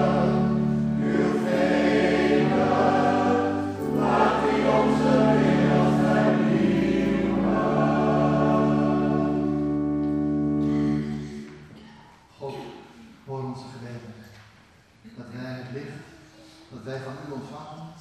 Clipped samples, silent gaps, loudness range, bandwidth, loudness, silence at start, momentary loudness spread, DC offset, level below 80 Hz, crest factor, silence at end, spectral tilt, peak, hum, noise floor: under 0.1%; none; 18 LU; 9.8 kHz; -22 LUFS; 0 s; 18 LU; under 0.1%; -48 dBFS; 16 dB; 0 s; -7.5 dB/octave; -8 dBFS; none; -55 dBFS